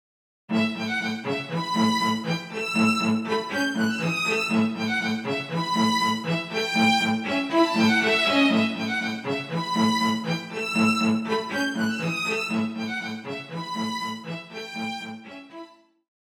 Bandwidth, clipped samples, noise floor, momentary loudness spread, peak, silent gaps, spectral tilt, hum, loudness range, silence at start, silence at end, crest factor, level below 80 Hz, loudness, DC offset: 16.5 kHz; under 0.1%; -46 dBFS; 12 LU; -8 dBFS; none; -4.5 dB/octave; none; 7 LU; 0.5 s; 0.7 s; 16 dB; -76 dBFS; -24 LUFS; under 0.1%